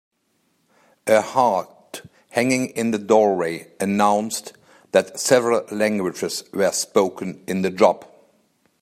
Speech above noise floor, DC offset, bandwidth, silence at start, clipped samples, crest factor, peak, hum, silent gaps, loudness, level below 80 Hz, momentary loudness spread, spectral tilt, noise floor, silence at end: 48 dB; under 0.1%; 15.5 kHz; 1.05 s; under 0.1%; 20 dB; -2 dBFS; none; none; -21 LUFS; -68 dBFS; 14 LU; -4 dB/octave; -68 dBFS; 0.75 s